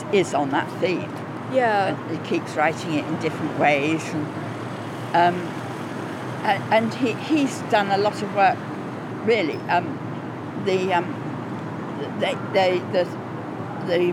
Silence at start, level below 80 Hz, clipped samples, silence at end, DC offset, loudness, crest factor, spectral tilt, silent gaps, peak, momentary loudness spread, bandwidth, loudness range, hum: 0 s; -74 dBFS; under 0.1%; 0 s; under 0.1%; -24 LUFS; 16 dB; -5.5 dB/octave; none; -6 dBFS; 11 LU; 15.5 kHz; 3 LU; none